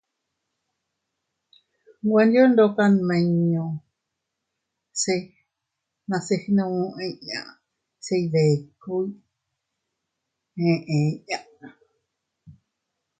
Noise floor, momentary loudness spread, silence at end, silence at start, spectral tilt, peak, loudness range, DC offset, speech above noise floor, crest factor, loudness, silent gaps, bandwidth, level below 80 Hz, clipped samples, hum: -82 dBFS; 15 LU; 0.7 s; 2.05 s; -6 dB/octave; -6 dBFS; 8 LU; under 0.1%; 61 dB; 20 dB; -23 LUFS; none; 9.4 kHz; -68 dBFS; under 0.1%; none